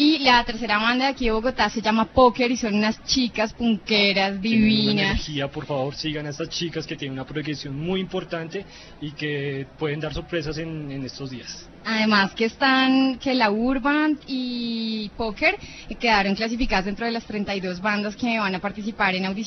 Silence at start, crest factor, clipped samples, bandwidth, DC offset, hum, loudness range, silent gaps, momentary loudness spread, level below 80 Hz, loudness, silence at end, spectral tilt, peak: 0 s; 20 dB; under 0.1%; 6.4 kHz; under 0.1%; none; 9 LU; none; 13 LU; -42 dBFS; -23 LUFS; 0 s; -4.5 dB/octave; -4 dBFS